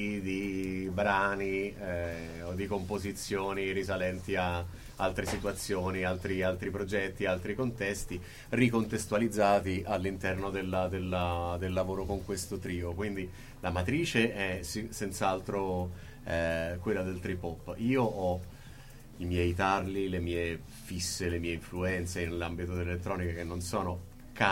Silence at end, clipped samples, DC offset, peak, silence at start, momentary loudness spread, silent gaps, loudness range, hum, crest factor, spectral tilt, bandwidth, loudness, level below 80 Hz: 0 s; under 0.1%; under 0.1%; -10 dBFS; 0 s; 9 LU; none; 3 LU; none; 24 dB; -5.5 dB/octave; 16.5 kHz; -33 LUFS; -50 dBFS